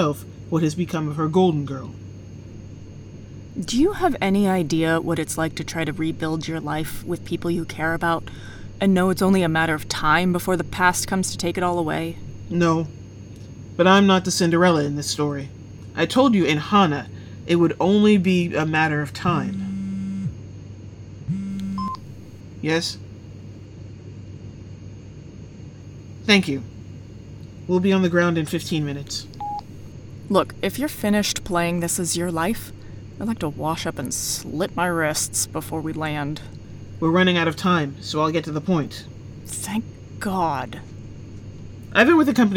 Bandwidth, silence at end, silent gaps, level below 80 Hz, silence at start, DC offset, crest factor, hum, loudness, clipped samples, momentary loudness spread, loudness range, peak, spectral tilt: over 20 kHz; 0 s; none; -48 dBFS; 0 s; under 0.1%; 20 dB; none; -22 LUFS; under 0.1%; 22 LU; 9 LU; -4 dBFS; -5 dB/octave